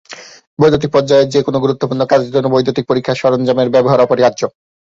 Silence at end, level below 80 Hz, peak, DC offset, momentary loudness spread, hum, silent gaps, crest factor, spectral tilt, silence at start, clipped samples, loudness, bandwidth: 0.45 s; -48 dBFS; 0 dBFS; under 0.1%; 9 LU; none; 0.47-0.57 s; 12 dB; -6.5 dB/octave; 0.1 s; under 0.1%; -13 LUFS; 7.8 kHz